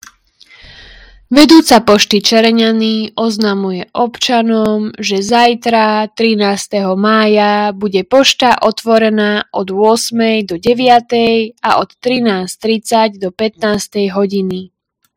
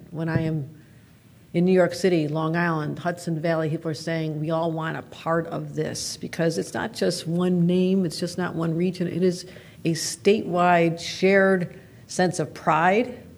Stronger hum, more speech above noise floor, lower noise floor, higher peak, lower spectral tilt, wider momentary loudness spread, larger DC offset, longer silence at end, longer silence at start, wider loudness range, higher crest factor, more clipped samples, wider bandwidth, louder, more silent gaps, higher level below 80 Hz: neither; first, 34 dB vs 28 dB; second, -45 dBFS vs -52 dBFS; first, 0 dBFS vs -6 dBFS; second, -4 dB/octave vs -5.5 dB/octave; about the same, 8 LU vs 10 LU; neither; first, 0.5 s vs 0 s; first, 0.8 s vs 0 s; about the same, 3 LU vs 5 LU; second, 12 dB vs 18 dB; first, 1% vs under 0.1%; second, 17 kHz vs over 20 kHz; first, -11 LUFS vs -24 LUFS; neither; first, -48 dBFS vs -60 dBFS